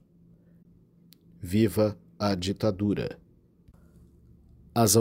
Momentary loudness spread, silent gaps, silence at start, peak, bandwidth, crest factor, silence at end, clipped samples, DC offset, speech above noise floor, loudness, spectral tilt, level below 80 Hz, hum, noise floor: 12 LU; none; 1.4 s; -8 dBFS; 16 kHz; 20 dB; 0 s; under 0.1%; under 0.1%; 32 dB; -27 LUFS; -5 dB/octave; -56 dBFS; none; -58 dBFS